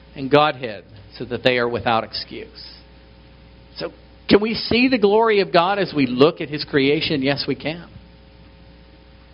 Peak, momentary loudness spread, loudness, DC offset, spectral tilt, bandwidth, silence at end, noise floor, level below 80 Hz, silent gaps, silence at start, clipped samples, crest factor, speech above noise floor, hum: 0 dBFS; 19 LU; -19 LUFS; under 0.1%; -3.5 dB/octave; 5.6 kHz; 1.35 s; -46 dBFS; -48 dBFS; none; 0.15 s; under 0.1%; 20 dB; 27 dB; none